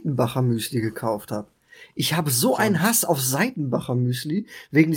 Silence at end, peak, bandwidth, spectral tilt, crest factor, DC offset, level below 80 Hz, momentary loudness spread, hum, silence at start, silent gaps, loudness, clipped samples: 0 s; -4 dBFS; 17 kHz; -4.5 dB/octave; 18 dB; under 0.1%; -62 dBFS; 10 LU; none; 0 s; none; -23 LUFS; under 0.1%